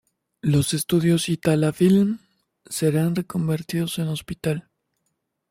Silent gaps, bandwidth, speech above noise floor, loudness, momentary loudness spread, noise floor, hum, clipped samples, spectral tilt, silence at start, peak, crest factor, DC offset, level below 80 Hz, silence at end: none; 16 kHz; 54 dB; -22 LUFS; 10 LU; -75 dBFS; none; under 0.1%; -6 dB/octave; 0.45 s; -6 dBFS; 16 dB; under 0.1%; -54 dBFS; 0.9 s